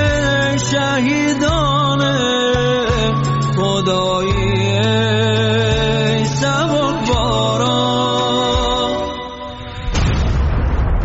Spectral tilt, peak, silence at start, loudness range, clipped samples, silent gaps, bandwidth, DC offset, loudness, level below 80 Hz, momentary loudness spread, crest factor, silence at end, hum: -4 dB/octave; -4 dBFS; 0 s; 2 LU; under 0.1%; none; 8 kHz; under 0.1%; -16 LUFS; -26 dBFS; 4 LU; 12 dB; 0 s; none